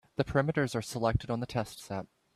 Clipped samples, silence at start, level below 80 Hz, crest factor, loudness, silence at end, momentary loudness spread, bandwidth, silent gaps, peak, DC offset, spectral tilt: under 0.1%; 0.2 s; -50 dBFS; 20 dB; -32 LUFS; 0.3 s; 11 LU; 14 kHz; none; -14 dBFS; under 0.1%; -6 dB/octave